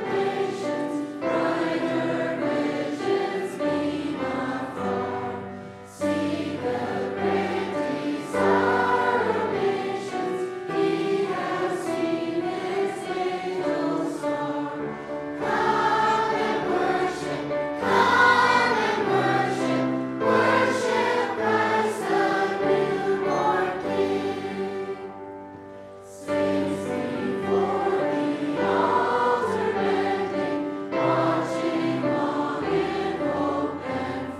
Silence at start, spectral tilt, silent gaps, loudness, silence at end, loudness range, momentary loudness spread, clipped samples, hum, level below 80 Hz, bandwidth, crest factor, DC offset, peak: 0 s; -5.5 dB/octave; none; -25 LUFS; 0 s; 7 LU; 8 LU; under 0.1%; none; -62 dBFS; 13 kHz; 18 dB; under 0.1%; -6 dBFS